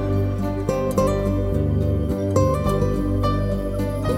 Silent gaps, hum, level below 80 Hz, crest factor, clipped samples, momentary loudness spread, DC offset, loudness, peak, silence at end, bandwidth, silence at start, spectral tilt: none; 50 Hz at -30 dBFS; -28 dBFS; 16 dB; under 0.1%; 4 LU; under 0.1%; -22 LUFS; -6 dBFS; 0 s; 15.5 kHz; 0 s; -8 dB/octave